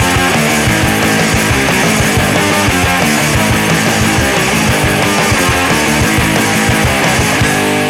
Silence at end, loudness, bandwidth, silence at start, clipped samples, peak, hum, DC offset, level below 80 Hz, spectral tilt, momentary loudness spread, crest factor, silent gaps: 0 s; -10 LUFS; 17 kHz; 0 s; under 0.1%; -2 dBFS; none; under 0.1%; -26 dBFS; -4 dB/octave; 1 LU; 10 dB; none